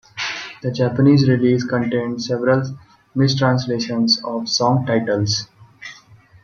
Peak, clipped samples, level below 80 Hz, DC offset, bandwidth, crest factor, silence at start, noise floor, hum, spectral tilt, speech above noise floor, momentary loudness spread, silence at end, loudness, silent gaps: -2 dBFS; under 0.1%; -56 dBFS; under 0.1%; 7.2 kHz; 16 dB; 0.15 s; -47 dBFS; none; -5.5 dB/octave; 30 dB; 17 LU; 0.3 s; -18 LUFS; none